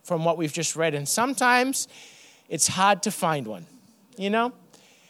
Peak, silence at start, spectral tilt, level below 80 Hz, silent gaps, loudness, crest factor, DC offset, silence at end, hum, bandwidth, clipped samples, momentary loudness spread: -4 dBFS; 0.05 s; -3 dB/octave; -72 dBFS; none; -24 LUFS; 20 dB; under 0.1%; 0.6 s; none; 19.5 kHz; under 0.1%; 13 LU